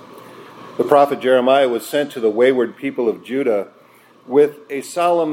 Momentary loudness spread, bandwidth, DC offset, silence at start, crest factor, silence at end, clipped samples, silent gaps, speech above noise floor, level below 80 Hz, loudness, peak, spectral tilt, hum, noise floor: 10 LU; 16.5 kHz; under 0.1%; 0.15 s; 18 dB; 0 s; under 0.1%; none; 32 dB; -74 dBFS; -17 LUFS; 0 dBFS; -5 dB/octave; none; -49 dBFS